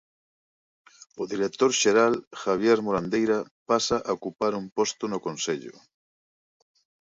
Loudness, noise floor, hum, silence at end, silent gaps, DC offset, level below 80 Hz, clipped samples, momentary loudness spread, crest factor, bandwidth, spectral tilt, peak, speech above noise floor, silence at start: -25 LUFS; under -90 dBFS; none; 1.3 s; 2.27-2.31 s, 3.51-3.66 s, 4.72-4.76 s; under 0.1%; -64 dBFS; under 0.1%; 10 LU; 18 dB; 7.8 kHz; -3.5 dB/octave; -8 dBFS; over 65 dB; 1.15 s